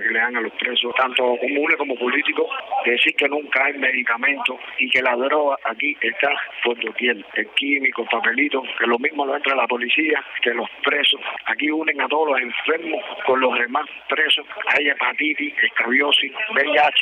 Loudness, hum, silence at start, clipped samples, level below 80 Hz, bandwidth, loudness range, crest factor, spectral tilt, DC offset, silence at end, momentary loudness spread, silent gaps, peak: -19 LUFS; none; 0 s; under 0.1%; -76 dBFS; 10 kHz; 2 LU; 16 dB; -3 dB/octave; under 0.1%; 0 s; 6 LU; none; -4 dBFS